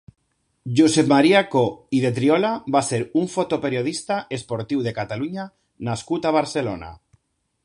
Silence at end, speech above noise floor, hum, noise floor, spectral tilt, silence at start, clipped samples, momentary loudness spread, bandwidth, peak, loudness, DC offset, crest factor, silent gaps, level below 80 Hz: 0.7 s; 43 dB; none; -63 dBFS; -5.5 dB/octave; 0.65 s; under 0.1%; 13 LU; 11.5 kHz; -2 dBFS; -21 LUFS; under 0.1%; 18 dB; none; -56 dBFS